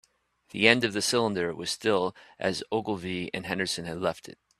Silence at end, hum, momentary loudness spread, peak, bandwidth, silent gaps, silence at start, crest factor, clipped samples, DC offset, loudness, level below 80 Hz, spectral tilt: 0.3 s; none; 11 LU; -2 dBFS; 14 kHz; none; 0.55 s; 26 dB; under 0.1%; under 0.1%; -27 LUFS; -64 dBFS; -3.5 dB/octave